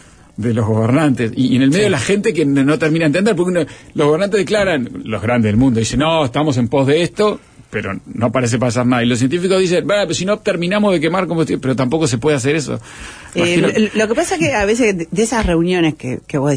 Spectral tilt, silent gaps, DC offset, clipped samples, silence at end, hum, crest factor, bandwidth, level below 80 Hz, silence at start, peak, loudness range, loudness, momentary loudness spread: -5.5 dB/octave; none; under 0.1%; under 0.1%; 0 s; none; 12 dB; 10.5 kHz; -38 dBFS; 0.4 s; -2 dBFS; 2 LU; -15 LUFS; 8 LU